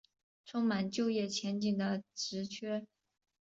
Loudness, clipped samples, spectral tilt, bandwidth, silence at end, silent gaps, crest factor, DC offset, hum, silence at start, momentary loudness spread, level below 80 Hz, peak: -36 LUFS; under 0.1%; -5 dB/octave; 8 kHz; 0.55 s; none; 14 dB; under 0.1%; none; 0.45 s; 7 LU; -76 dBFS; -22 dBFS